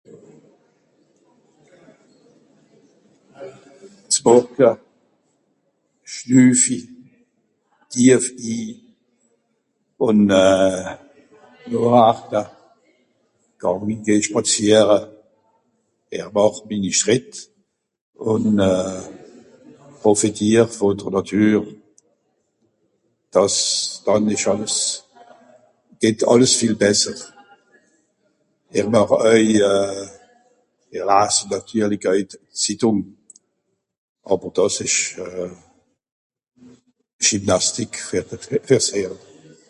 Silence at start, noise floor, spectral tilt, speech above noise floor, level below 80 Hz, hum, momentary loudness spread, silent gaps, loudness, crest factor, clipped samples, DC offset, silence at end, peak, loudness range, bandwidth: 0.15 s; -73 dBFS; -4 dB/octave; 56 dB; -56 dBFS; none; 18 LU; 18.01-18.13 s, 33.98-34.15 s, 36.12-36.30 s, 37.13-37.19 s; -18 LUFS; 20 dB; under 0.1%; under 0.1%; 0.55 s; 0 dBFS; 4 LU; 11.5 kHz